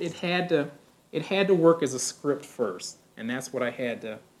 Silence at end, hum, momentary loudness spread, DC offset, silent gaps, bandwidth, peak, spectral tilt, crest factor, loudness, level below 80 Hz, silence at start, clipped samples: 0.2 s; none; 16 LU; under 0.1%; none; 14 kHz; -6 dBFS; -4.5 dB/octave; 20 dB; -27 LUFS; -76 dBFS; 0 s; under 0.1%